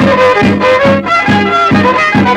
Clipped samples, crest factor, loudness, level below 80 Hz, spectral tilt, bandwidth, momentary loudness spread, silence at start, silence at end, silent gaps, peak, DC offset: under 0.1%; 8 dB; -8 LUFS; -38 dBFS; -6 dB/octave; 10.5 kHz; 2 LU; 0 s; 0 s; none; 0 dBFS; under 0.1%